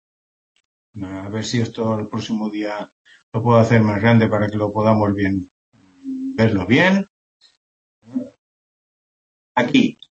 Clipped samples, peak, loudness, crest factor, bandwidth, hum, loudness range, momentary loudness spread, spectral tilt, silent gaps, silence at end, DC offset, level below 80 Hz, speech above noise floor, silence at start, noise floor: under 0.1%; -2 dBFS; -19 LUFS; 18 dB; 8 kHz; none; 7 LU; 17 LU; -7 dB/octave; 2.92-3.05 s, 3.23-3.32 s, 5.51-5.72 s, 7.09-7.40 s, 7.57-8.02 s, 8.38-9.55 s; 0.2 s; under 0.1%; -54 dBFS; over 72 dB; 0.95 s; under -90 dBFS